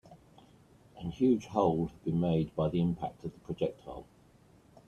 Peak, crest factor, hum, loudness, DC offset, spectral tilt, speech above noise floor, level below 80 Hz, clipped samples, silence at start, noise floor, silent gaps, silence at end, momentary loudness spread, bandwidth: -12 dBFS; 22 dB; none; -32 LUFS; under 0.1%; -9 dB/octave; 30 dB; -58 dBFS; under 0.1%; 0.1 s; -61 dBFS; none; 0.85 s; 16 LU; 7 kHz